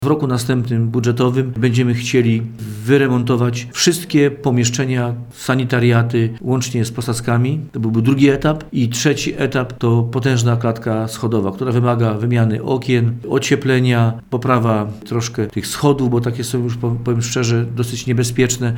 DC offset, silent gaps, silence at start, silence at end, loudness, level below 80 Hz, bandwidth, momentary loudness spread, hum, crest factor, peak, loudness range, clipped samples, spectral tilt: under 0.1%; none; 0 s; 0 s; -17 LUFS; -46 dBFS; 17 kHz; 6 LU; none; 16 dB; 0 dBFS; 2 LU; under 0.1%; -6 dB/octave